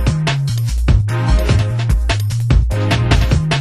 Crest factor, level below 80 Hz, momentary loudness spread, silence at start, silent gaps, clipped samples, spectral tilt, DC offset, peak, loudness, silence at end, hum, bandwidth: 14 dB; -18 dBFS; 3 LU; 0 s; none; under 0.1%; -6 dB/octave; under 0.1%; 0 dBFS; -16 LUFS; 0 s; none; 12.5 kHz